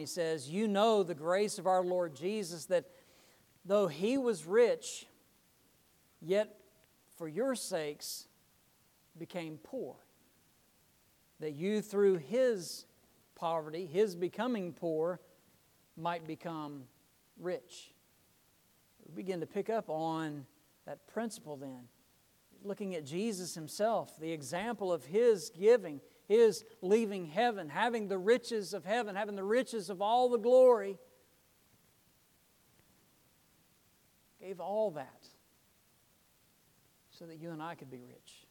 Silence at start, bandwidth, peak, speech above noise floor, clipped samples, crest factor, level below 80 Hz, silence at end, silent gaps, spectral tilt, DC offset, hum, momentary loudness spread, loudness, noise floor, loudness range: 0 s; 18.5 kHz; -16 dBFS; 36 dB; under 0.1%; 20 dB; -82 dBFS; 0.15 s; none; -5 dB/octave; under 0.1%; none; 18 LU; -34 LUFS; -70 dBFS; 13 LU